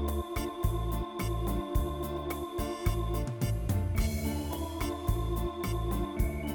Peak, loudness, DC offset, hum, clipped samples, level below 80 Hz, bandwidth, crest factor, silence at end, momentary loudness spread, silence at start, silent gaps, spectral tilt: -14 dBFS; -33 LUFS; under 0.1%; none; under 0.1%; -36 dBFS; 19.5 kHz; 16 dB; 0 s; 4 LU; 0 s; none; -6.5 dB/octave